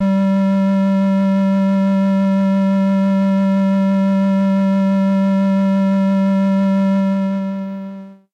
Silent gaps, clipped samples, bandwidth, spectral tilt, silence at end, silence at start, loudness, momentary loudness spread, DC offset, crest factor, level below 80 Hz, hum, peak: none; under 0.1%; 6 kHz; -9 dB/octave; 0.2 s; 0 s; -15 LUFS; 4 LU; under 0.1%; 4 dB; -64 dBFS; none; -10 dBFS